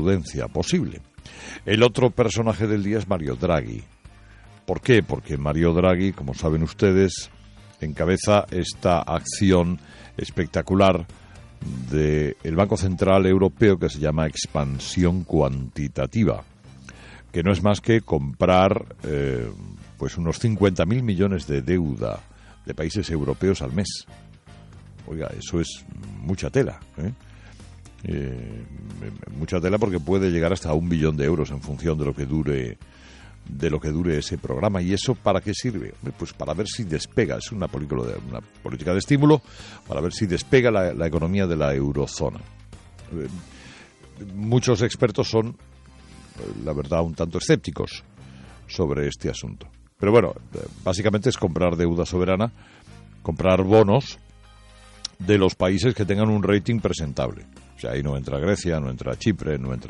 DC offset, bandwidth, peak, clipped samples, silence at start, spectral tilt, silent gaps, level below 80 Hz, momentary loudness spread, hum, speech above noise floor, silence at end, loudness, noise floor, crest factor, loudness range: under 0.1%; 11 kHz; -4 dBFS; under 0.1%; 0 s; -6.5 dB/octave; none; -42 dBFS; 17 LU; none; 26 dB; 0 s; -23 LUFS; -48 dBFS; 18 dB; 6 LU